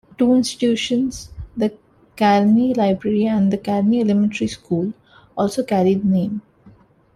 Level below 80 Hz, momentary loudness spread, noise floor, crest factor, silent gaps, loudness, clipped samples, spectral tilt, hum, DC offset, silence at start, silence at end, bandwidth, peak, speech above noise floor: -50 dBFS; 10 LU; -49 dBFS; 14 dB; none; -19 LUFS; under 0.1%; -6.5 dB/octave; none; under 0.1%; 0.2 s; 0.45 s; 12 kHz; -4 dBFS; 32 dB